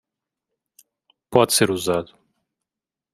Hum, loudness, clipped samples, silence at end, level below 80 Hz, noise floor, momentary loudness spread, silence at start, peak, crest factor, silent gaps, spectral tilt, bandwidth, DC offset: none; -20 LUFS; under 0.1%; 1.1 s; -62 dBFS; -88 dBFS; 9 LU; 1.3 s; 0 dBFS; 24 dB; none; -3.5 dB/octave; 15.5 kHz; under 0.1%